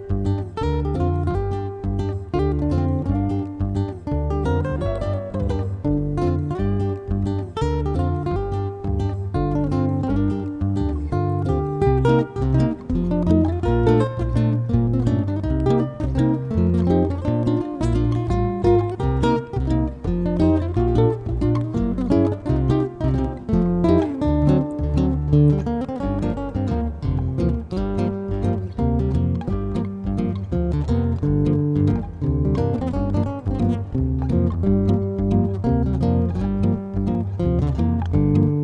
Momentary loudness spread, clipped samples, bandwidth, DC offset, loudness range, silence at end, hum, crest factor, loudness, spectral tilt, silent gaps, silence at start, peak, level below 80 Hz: 6 LU; under 0.1%; 9 kHz; under 0.1%; 4 LU; 0 s; none; 16 dB; -22 LUFS; -9.5 dB/octave; none; 0 s; -4 dBFS; -30 dBFS